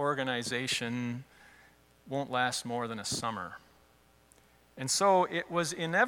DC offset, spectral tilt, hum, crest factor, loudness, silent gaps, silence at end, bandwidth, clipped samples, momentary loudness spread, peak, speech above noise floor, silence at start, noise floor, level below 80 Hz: under 0.1%; -3 dB/octave; none; 20 dB; -32 LUFS; none; 0 s; 18 kHz; under 0.1%; 14 LU; -14 dBFS; 32 dB; 0 s; -64 dBFS; -70 dBFS